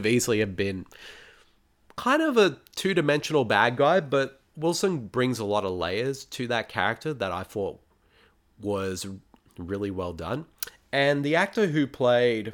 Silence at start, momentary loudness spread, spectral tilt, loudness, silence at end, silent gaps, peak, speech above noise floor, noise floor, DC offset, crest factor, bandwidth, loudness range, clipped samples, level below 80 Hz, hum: 0 s; 14 LU; -5 dB/octave; -26 LUFS; 0 s; none; -6 dBFS; 36 dB; -62 dBFS; under 0.1%; 20 dB; 19 kHz; 9 LU; under 0.1%; -58 dBFS; none